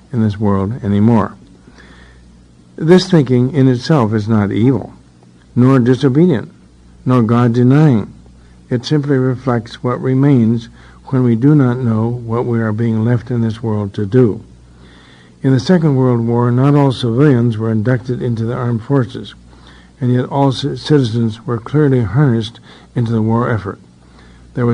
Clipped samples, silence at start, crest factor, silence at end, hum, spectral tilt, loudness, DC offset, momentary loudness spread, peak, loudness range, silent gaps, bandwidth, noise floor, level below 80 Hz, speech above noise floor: under 0.1%; 0.1 s; 14 dB; 0 s; none; -8.5 dB/octave; -14 LUFS; under 0.1%; 10 LU; 0 dBFS; 4 LU; none; 10 kHz; -44 dBFS; -46 dBFS; 31 dB